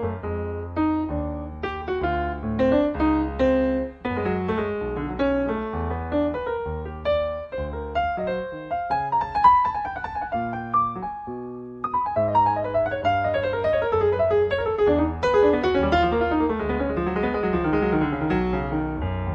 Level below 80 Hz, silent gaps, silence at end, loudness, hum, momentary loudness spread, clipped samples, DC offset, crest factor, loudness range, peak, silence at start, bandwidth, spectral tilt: -38 dBFS; none; 0 s; -24 LUFS; none; 9 LU; under 0.1%; under 0.1%; 18 dB; 5 LU; -4 dBFS; 0 s; 7.2 kHz; -8.5 dB/octave